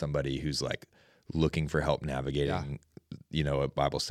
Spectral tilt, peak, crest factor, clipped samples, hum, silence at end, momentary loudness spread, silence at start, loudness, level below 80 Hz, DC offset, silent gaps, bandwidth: -5.5 dB/octave; -12 dBFS; 20 dB; under 0.1%; none; 0 s; 11 LU; 0 s; -32 LUFS; -46 dBFS; under 0.1%; none; 13.5 kHz